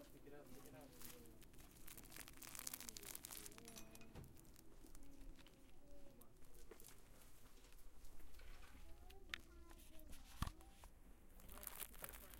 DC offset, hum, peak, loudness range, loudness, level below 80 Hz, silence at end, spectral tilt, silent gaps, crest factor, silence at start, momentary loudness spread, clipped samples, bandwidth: under 0.1%; none; -24 dBFS; 10 LU; -58 LUFS; -64 dBFS; 0 s; -3 dB/octave; none; 32 dB; 0 s; 15 LU; under 0.1%; 17 kHz